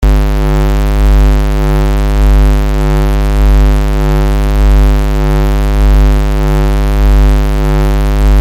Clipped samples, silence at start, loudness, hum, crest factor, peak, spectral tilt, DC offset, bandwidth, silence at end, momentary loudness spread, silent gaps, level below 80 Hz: under 0.1%; 0 s; -11 LUFS; 50 Hz at -10 dBFS; 6 dB; -2 dBFS; -7 dB/octave; under 0.1%; 15.5 kHz; 0 s; 3 LU; none; -8 dBFS